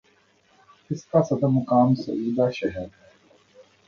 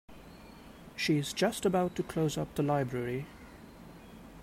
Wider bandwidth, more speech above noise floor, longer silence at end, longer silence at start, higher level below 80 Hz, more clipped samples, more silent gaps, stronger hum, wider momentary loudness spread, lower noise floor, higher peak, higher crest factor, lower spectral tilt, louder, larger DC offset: second, 7 kHz vs 16 kHz; first, 39 dB vs 20 dB; first, 1 s vs 0 s; first, 0.9 s vs 0.1 s; about the same, -58 dBFS vs -58 dBFS; neither; neither; neither; second, 14 LU vs 22 LU; first, -61 dBFS vs -51 dBFS; first, -4 dBFS vs -16 dBFS; about the same, 20 dB vs 18 dB; first, -8.5 dB/octave vs -5.5 dB/octave; first, -23 LUFS vs -32 LUFS; neither